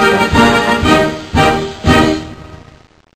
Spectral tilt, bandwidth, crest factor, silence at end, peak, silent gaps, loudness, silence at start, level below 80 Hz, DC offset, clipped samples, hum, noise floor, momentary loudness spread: -5 dB/octave; 14.5 kHz; 12 dB; 0.6 s; 0 dBFS; none; -11 LUFS; 0 s; -28 dBFS; 0.3%; under 0.1%; none; -43 dBFS; 6 LU